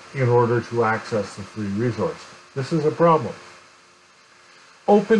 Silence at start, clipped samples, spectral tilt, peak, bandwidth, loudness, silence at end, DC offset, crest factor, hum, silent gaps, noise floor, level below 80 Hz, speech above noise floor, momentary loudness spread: 0.05 s; under 0.1%; -7.5 dB/octave; -6 dBFS; 11 kHz; -22 LUFS; 0 s; under 0.1%; 16 dB; none; none; -53 dBFS; -62 dBFS; 32 dB; 15 LU